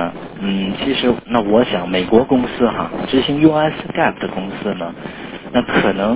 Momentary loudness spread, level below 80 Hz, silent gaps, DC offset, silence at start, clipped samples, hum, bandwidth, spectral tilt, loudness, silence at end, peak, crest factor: 11 LU; -42 dBFS; none; under 0.1%; 0 s; under 0.1%; none; 4 kHz; -10 dB/octave; -17 LUFS; 0 s; 0 dBFS; 16 dB